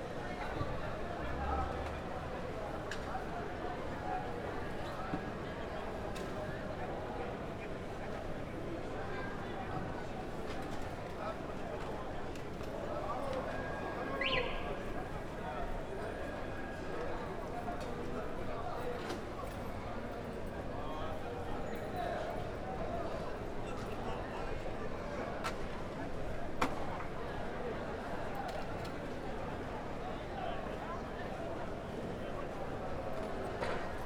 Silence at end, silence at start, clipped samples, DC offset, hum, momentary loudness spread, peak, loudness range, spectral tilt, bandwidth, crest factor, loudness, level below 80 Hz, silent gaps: 0 s; 0 s; under 0.1%; under 0.1%; none; 4 LU; -16 dBFS; 3 LU; -6 dB/octave; 16.5 kHz; 24 dB; -41 LUFS; -48 dBFS; none